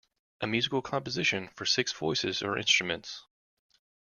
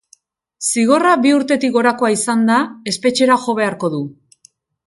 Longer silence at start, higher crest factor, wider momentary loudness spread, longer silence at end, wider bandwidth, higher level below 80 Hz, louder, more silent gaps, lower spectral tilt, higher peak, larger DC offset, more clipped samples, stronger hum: second, 0.4 s vs 0.6 s; about the same, 20 dB vs 16 dB; first, 12 LU vs 9 LU; about the same, 0.85 s vs 0.75 s; second, 10 kHz vs 12 kHz; about the same, -66 dBFS vs -64 dBFS; second, -29 LUFS vs -15 LUFS; neither; about the same, -2.5 dB/octave vs -3.5 dB/octave; second, -12 dBFS vs 0 dBFS; neither; neither; neither